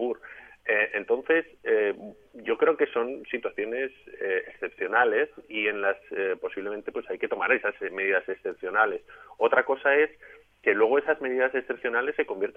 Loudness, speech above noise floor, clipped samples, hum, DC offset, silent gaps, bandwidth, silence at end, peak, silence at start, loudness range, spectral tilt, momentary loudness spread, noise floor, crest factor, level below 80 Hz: -27 LUFS; 21 dB; under 0.1%; none; under 0.1%; none; 3.6 kHz; 0.05 s; -6 dBFS; 0 s; 3 LU; -6 dB/octave; 11 LU; -48 dBFS; 20 dB; -70 dBFS